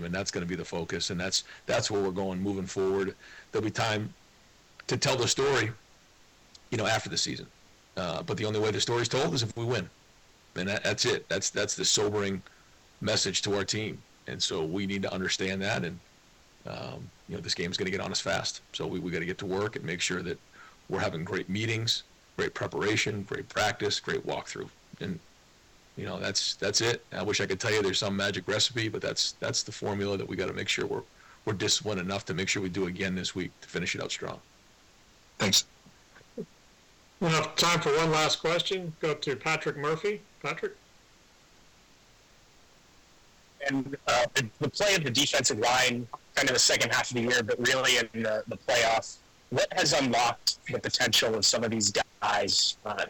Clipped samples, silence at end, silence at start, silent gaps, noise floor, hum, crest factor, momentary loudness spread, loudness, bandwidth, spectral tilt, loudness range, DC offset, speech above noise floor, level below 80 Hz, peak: under 0.1%; 0 s; 0 s; none; -59 dBFS; none; 18 dB; 14 LU; -28 LUFS; 19 kHz; -3 dB/octave; 8 LU; under 0.1%; 30 dB; -60 dBFS; -12 dBFS